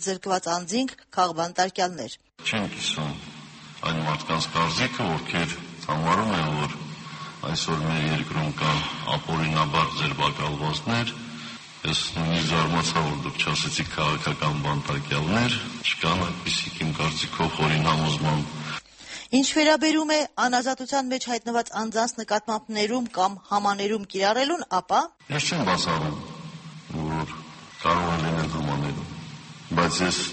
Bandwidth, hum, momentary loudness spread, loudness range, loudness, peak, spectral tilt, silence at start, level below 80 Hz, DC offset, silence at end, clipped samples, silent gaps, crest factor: 8.8 kHz; none; 12 LU; 4 LU; -25 LUFS; -6 dBFS; -4 dB/octave; 0 s; -50 dBFS; under 0.1%; 0 s; under 0.1%; none; 18 dB